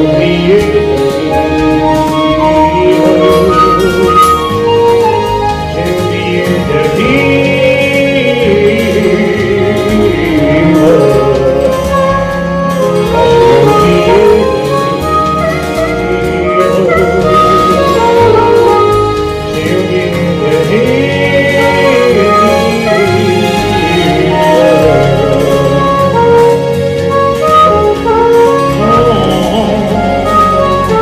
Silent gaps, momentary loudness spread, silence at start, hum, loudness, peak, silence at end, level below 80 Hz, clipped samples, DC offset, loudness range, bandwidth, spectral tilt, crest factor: none; 6 LU; 0 s; none; -8 LUFS; 0 dBFS; 0 s; -28 dBFS; 0.6%; under 0.1%; 2 LU; 15.5 kHz; -6 dB/octave; 8 dB